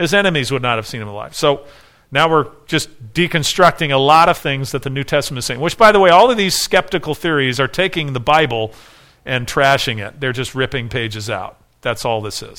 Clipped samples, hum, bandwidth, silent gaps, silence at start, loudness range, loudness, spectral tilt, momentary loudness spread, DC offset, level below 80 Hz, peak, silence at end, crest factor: under 0.1%; none; 18 kHz; none; 0 s; 6 LU; -15 LUFS; -4 dB/octave; 13 LU; under 0.1%; -42 dBFS; 0 dBFS; 0.05 s; 16 dB